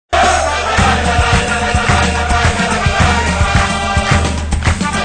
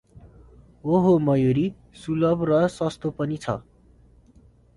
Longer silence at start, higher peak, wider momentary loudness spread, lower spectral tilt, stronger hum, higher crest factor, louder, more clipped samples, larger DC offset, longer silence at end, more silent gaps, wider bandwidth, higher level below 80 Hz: about the same, 0.1 s vs 0.15 s; first, 0 dBFS vs -8 dBFS; second, 3 LU vs 12 LU; second, -4 dB/octave vs -8 dB/octave; neither; about the same, 12 dB vs 16 dB; first, -13 LUFS vs -23 LUFS; neither; neither; second, 0 s vs 1.15 s; neither; second, 9.8 kHz vs 11.5 kHz; first, -20 dBFS vs -52 dBFS